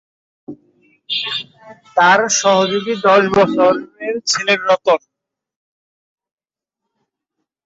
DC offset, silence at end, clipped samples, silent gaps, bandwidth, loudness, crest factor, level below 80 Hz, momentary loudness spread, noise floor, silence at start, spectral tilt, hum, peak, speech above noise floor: under 0.1%; 2.7 s; under 0.1%; none; 8 kHz; -15 LUFS; 16 dB; -58 dBFS; 11 LU; -86 dBFS; 0.5 s; -2.5 dB/octave; none; -2 dBFS; 71 dB